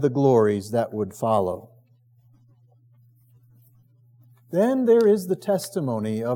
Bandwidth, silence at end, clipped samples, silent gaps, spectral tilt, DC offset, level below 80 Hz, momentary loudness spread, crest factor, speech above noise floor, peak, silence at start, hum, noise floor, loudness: 17.5 kHz; 0 s; under 0.1%; none; -7 dB/octave; under 0.1%; -76 dBFS; 10 LU; 16 dB; 37 dB; -8 dBFS; 0 s; none; -58 dBFS; -22 LUFS